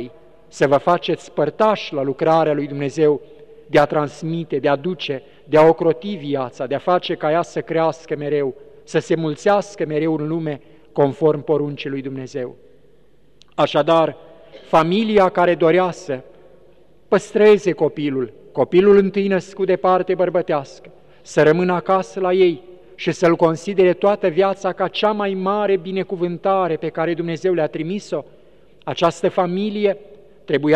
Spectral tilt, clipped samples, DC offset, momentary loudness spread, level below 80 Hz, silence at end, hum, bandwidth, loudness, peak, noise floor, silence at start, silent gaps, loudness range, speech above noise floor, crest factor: -6.5 dB/octave; under 0.1%; 0.4%; 11 LU; -56 dBFS; 0 s; none; 9.6 kHz; -19 LUFS; -2 dBFS; -55 dBFS; 0 s; none; 5 LU; 38 dB; 16 dB